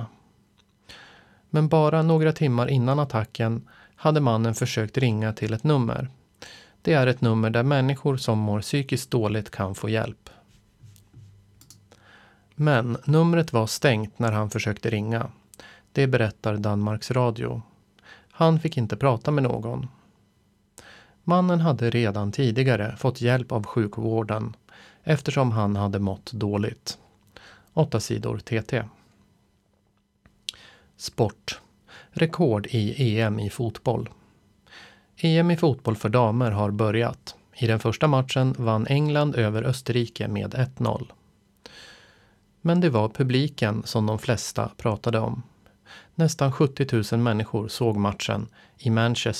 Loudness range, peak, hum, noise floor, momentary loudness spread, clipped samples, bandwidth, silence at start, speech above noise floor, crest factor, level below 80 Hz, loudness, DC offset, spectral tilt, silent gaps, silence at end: 6 LU; -6 dBFS; none; -67 dBFS; 11 LU; under 0.1%; 14 kHz; 0 s; 44 dB; 18 dB; -56 dBFS; -24 LUFS; under 0.1%; -6.5 dB/octave; none; 0 s